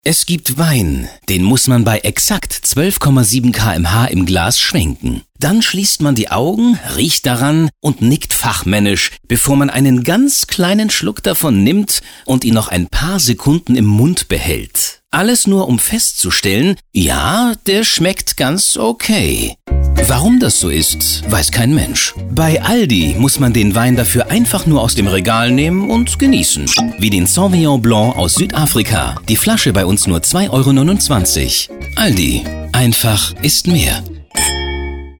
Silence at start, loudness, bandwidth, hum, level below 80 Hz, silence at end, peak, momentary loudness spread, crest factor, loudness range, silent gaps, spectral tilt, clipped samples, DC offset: 0.05 s; -12 LUFS; over 20 kHz; none; -28 dBFS; 0.05 s; -2 dBFS; 5 LU; 10 dB; 1 LU; none; -4 dB/octave; under 0.1%; under 0.1%